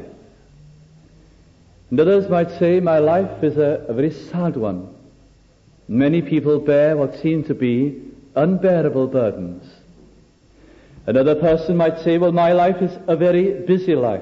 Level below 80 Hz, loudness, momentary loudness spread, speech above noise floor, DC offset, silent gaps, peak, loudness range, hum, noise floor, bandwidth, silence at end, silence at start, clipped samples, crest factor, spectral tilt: -50 dBFS; -18 LUFS; 8 LU; 35 dB; under 0.1%; none; -6 dBFS; 4 LU; none; -52 dBFS; 7.2 kHz; 0 s; 0 s; under 0.1%; 14 dB; -9.5 dB/octave